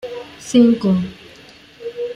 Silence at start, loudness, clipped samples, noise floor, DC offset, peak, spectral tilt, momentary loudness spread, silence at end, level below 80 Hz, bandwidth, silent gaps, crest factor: 0.05 s; -16 LUFS; under 0.1%; -44 dBFS; under 0.1%; -2 dBFS; -6.5 dB/octave; 19 LU; 0 s; -54 dBFS; 10.5 kHz; none; 16 dB